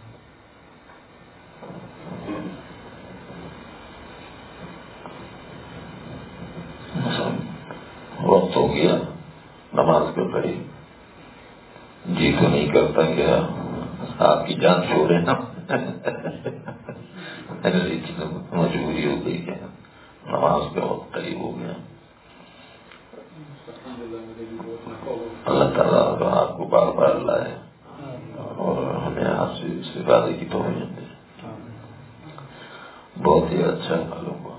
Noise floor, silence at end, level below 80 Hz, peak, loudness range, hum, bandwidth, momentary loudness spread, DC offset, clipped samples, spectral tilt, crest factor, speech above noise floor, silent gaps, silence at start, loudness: -49 dBFS; 0 s; -50 dBFS; 0 dBFS; 17 LU; none; 4 kHz; 23 LU; under 0.1%; under 0.1%; -10.5 dB/octave; 24 dB; 28 dB; none; 0 s; -22 LUFS